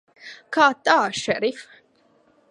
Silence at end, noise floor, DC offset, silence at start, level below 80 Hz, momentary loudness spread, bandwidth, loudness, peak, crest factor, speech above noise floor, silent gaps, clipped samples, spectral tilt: 0.9 s; -60 dBFS; under 0.1%; 0.25 s; -66 dBFS; 23 LU; 11.5 kHz; -20 LUFS; -2 dBFS; 22 dB; 39 dB; none; under 0.1%; -3 dB/octave